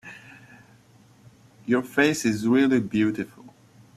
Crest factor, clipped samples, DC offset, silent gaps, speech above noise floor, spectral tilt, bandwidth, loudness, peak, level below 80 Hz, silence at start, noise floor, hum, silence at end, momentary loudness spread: 18 dB; under 0.1%; under 0.1%; none; 33 dB; -5 dB/octave; 14 kHz; -23 LUFS; -6 dBFS; -64 dBFS; 0.05 s; -55 dBFS; none; 0.5 s; 20 LU